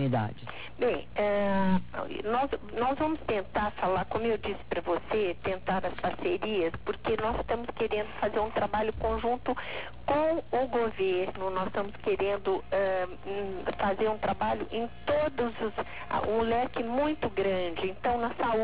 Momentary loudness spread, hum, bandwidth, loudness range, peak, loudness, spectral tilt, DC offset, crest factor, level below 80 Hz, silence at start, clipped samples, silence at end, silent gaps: 6 LU; none; 4 kHz; 1 LU; -16 dBFS; -31 LUFS; -4.5 dB/octave; 0.8%; 14 dB; -50 dBFS; 0 s; under 0.1%; 0 s; none